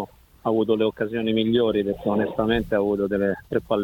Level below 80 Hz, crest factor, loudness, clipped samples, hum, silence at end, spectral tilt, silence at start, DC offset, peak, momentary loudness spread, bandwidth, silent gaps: -46 dBFS; 16 dB; -23 LUFS; under 0.1%; none; 0 s; -8 dB/octave; 0 s; under 0.1%; -8 dBFS; 5 LU; 17 kHz; none